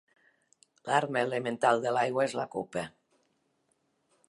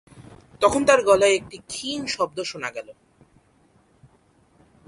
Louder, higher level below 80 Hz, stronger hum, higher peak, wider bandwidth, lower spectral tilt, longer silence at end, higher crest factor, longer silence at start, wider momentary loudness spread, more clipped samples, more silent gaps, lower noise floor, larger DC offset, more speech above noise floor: second, -30 LUFS vs -21 LUFS; second, -76 dBFS vs -56 dBFS; neither; second, -10 dBFS vs -4 dBFS; about the same, 11.5 kHz vs 11.5 kHz; first, -4.5 dB/octave vs -3 dB/octave; second, 1.4 s vs 1.95 s; about the same, 22 dB vs 22 dB; first, 0.85 s vs 0.2 s; second, 11 LU vs 15 LU; neither; neither; first, -75 dBFS vs -60 dBFS; neither; first, 46 dB vs 38 dB